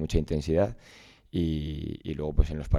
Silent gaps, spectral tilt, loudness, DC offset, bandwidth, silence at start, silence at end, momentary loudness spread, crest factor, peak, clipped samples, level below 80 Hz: none; -7.5 dB/octave; -30 LUFS; under 0.1%; 12 kHz; 0 s; 0 s; 8 LU; 20 dB; -8 dBFS; under 0.1%; -32 dBFS